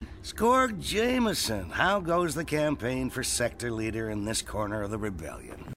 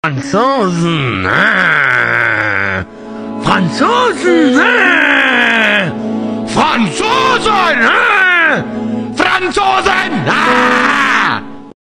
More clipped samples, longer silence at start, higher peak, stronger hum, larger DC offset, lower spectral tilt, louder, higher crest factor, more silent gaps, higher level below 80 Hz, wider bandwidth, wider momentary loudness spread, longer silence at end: neither; about the same, 0 s vs 0.05 s; second, -10 dBFS vs 0 dBFS; neither; first, 0.1% vs under 0.1%; about the same, -4 dB/octave vs -4.5 dB/octave; second, -28 LUFS vs -10 LUFS; first, 20 dB vs 12 dB; neither; about the same, -46 dBFS vs -44 dBFS; about the same, 16 kHz vs 15 kHz; about the same, 9 LU vs 9 LU; second, 0 s vs 0.15 s